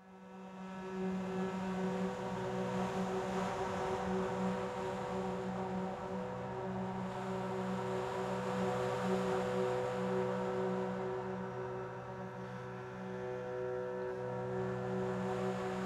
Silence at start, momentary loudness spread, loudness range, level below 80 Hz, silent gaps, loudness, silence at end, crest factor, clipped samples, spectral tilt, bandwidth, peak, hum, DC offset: 0 s; 9 LU; 5 LU; -64 dBFS; none; -39 LUFS; 0 s; 16 dB; under 0.1%; -6.5 dB/octave; 12.5 kHz; -24 dBFS; none; under 0.1%